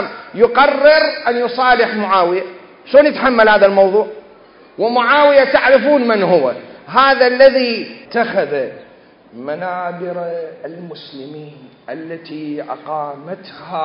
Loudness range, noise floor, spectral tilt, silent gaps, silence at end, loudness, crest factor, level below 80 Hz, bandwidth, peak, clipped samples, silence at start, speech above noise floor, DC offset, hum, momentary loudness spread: 15 LU; -44 dBFS; -8 dB/octave; none; 0 s; -13 LUFS; 14 dB; -54 dBFS; 5.4 kHz; 0 dBFS; under 0.1%; 0 s; 30 dB; under 0.1%; none; 21 LU